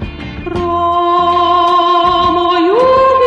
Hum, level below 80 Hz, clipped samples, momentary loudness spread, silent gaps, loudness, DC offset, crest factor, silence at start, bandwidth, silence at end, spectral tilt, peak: none; -34 dBFS; under 0.1%; 10 LU; none; -11 LUFS; under 0.1%; 10 dB; 0 s; 8.2 kHz; 0 s; -6 dB/octave; 0 dBFS